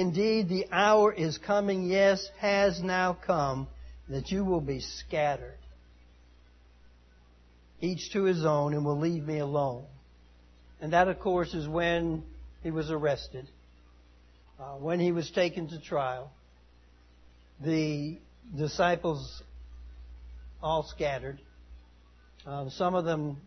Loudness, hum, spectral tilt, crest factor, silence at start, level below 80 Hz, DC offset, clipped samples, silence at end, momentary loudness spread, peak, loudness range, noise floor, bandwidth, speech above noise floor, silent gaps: -29 LUFS; 60 Hz at -55 dBFS; -6 dB/octave; 22 dB; 0 s; -52 dBFS; under 0.1%; under 0.1%; 0.05 s; 21 LU; -10 dBFS; 8 LU; -58 dBFS; 6.4 kHz; 29 dB; none